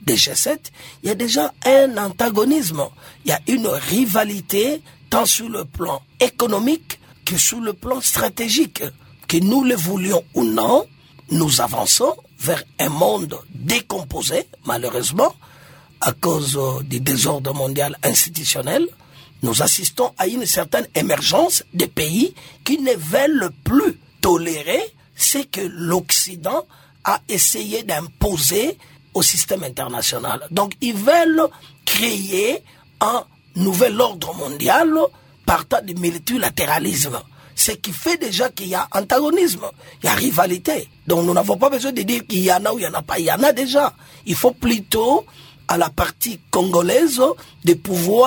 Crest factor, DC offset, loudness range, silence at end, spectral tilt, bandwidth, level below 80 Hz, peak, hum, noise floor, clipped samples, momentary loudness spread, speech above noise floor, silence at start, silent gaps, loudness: 18 dB; under 0.1%; 2 LU; 0 s; -3.5 dB/octave; over 20 kHz; -44 dBFS; 0 dBFS; none; -46 dBFS; under 0.1%; 10 LU; 27 dB; 0 s; none; -18 LUFS